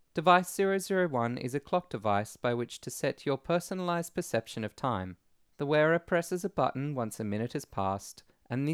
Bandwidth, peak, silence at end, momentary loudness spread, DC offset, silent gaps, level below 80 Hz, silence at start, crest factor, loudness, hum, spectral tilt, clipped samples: 17 kHz; -8 dBFS; 0 s; 10 LU; under 0.1%; none; -66 dBFS; 0.15 s; 22 dB; -31 LUFS; none; -5.5 dB/octave; under 0.1%